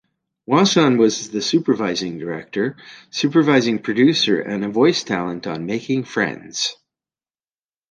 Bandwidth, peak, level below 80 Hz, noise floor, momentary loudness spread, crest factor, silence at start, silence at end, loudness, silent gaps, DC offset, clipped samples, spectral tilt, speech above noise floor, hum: 10 kHz; -2 dBFS; -62 dBFS; under -90 dBFS; 11 LU; 18 dB; 0.5 s; 1.15 s; -19 LUFS; none; under 0.1%; under 0.1%; -4.5 dB/octave; over 71 dB; none